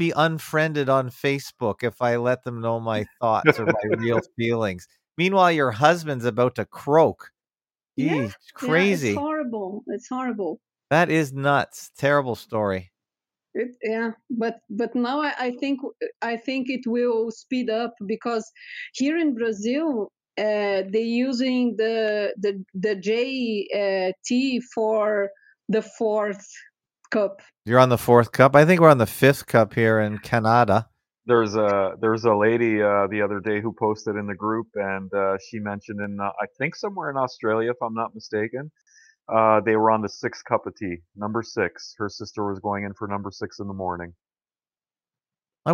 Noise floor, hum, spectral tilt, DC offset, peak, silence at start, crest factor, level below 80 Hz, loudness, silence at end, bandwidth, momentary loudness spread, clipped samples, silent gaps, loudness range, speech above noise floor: under -90 dBFS; none; -6 dB/octave; under 0.1%; 0 dBFS; 0 s; 22 dB; -64 dBFS; -23 LUFS; 0 s; 17 kHz; 13 LU; under 0.1%; 16.16-16.20 s; 9 LU; over 67 dB